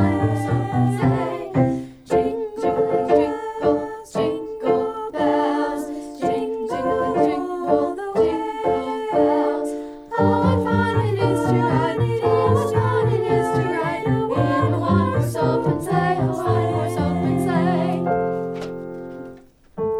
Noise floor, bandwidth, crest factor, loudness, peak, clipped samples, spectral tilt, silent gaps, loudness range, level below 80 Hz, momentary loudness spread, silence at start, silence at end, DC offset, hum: -44 dBFS; 14 kHz; 16 dB; -21 LUFS; -4 dBFS; under 0.1%; -8 dB/octave; none; 3 LU; -46 dBFS; 7 LU; 0 s; 0 s; under 0.1%; none